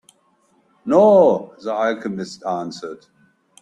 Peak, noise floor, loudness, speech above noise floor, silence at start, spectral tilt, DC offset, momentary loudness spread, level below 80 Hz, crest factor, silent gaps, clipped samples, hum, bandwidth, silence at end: -2 dBFS; -61 dBFS; -18 LUFS; 43 dB; 0.85 s; -6.5 dB/octave; under 0.1%; 20 LU; -66 dBFS; 18 dB; none; under 0.1%; none; 10.5 kHz; 0.65 s